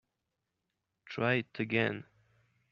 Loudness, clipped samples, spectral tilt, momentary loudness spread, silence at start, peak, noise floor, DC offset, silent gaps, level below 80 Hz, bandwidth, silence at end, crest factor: -32 LUFS; under 0.1%; -4.5 dB/octave; 13 LU; 1.05 s; -14 dBFS; -86 dBFS; under 0.1%; none; -76 dBFS; 7 kHz; 0.7 s; 24 dB